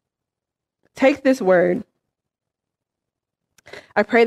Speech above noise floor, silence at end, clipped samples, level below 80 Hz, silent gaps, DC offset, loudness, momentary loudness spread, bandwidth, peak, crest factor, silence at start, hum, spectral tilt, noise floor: 69 dB; 0 s; under 0.1%; -64 dBFS; none; under 0.1%; -19 LUFS; 8 LU; 12.5 kHz; -4 dBFS; 18 dB; 0.95 s; none; -6 dB/octave; -85 dBFS